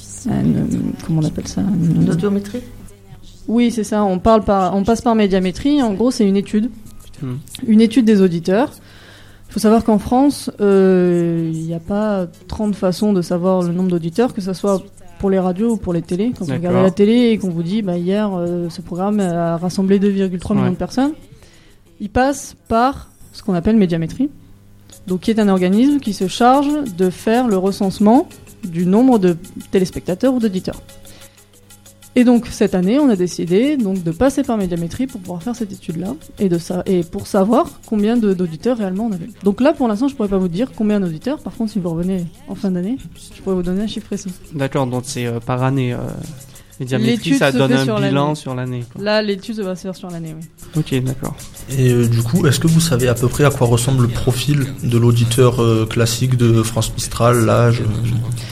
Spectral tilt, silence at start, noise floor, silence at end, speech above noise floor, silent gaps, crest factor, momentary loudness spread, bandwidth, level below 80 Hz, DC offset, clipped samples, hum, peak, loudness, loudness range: -6.5 dB/octave; 0 s; -46 dBFS; 0 s; 30 dB; none; 16 dB; 12 LU; 15.5 kHz; -40 dBFS; under 0.1%; under 0.1%; none; 0 dBFS; -17 LUFS; 5 LU